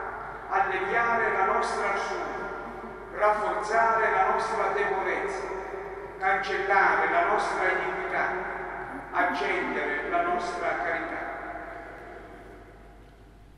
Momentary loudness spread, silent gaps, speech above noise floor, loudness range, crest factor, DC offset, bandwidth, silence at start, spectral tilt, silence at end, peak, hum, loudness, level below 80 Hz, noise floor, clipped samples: 15 LU; none; 25 dB; 4 LU; 18 dB; under 0.1%; 12 kHz; 0 s; -4 dB/octave; 0.1 s; -10 dBFS; none; -27 LUFS; -54 dBFS; -51 dBFS; under 0.1%